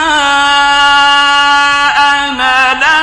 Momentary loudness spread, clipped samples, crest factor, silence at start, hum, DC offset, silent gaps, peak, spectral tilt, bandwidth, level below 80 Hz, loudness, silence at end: 3 LU; 0.2%; 8 dB; 0 s; none; under 0.1%; none; 0 dBFS; -0.5 dB/octave; 11.5 kHz; -40 dBFS; -7 LUFS; 0 s